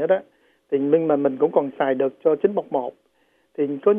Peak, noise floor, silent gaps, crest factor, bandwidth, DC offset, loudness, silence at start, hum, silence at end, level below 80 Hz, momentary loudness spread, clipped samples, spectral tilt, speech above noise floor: -4 dBFS; -64 dBFS; none; 18 dB; 3.6 kHz; under 0.1%; -22 LUFS; 0 s; none; 0 s; -78 dBFS; 8 LU; under 0.1%; -9.5 dB/octave; 43 dB